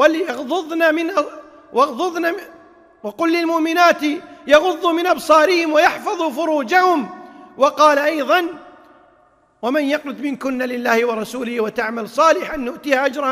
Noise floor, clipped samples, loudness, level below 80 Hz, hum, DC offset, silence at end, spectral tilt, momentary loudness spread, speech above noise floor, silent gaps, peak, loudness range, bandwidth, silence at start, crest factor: -55 dBFS; under 0.1%; -17 LUFS; -56 dBFS; none; under 0.1%; 0 s; -3 dB/octave; 12 LU; 38 dB; none; 0 dBFS; 5 LU; 16 kHz; 0 s; 18 dB